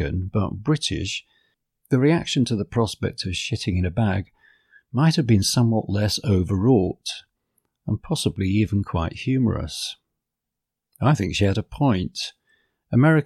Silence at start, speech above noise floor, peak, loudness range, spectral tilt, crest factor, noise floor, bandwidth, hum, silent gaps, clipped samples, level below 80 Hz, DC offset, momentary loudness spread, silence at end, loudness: 0 s; 63 dB; -6 dBFS; 4 LU; -6 dB/octave; 16 dB; -84 dBFS; 14 kHz; none; none; under 0.1%; -44 dBFS; under 0.1%; 11 LU; 0 s; -23 LUFS